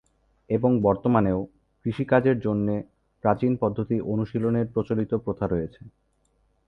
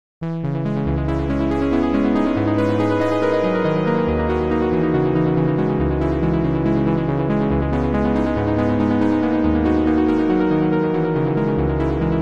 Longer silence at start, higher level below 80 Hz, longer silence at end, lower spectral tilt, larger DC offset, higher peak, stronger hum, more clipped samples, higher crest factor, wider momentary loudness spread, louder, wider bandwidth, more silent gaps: first, 0.5 s vs 0.2 s; second, -50 dBFS vs -32 dBFS; first, 0.8 s vs 0 s; first, -10.5 dB/octave vs -9 dB/octave; second, under 0.1% vs 1%; about the same, -6 dBFS vs -6 dBFS; neither; neither; first, 20 dB vs 12 dB; first, 9 LU vs 3 LU; second, -25 LUFS vs -19 LUFS; second, 5.2 kHz vs 7.4 kHz; neither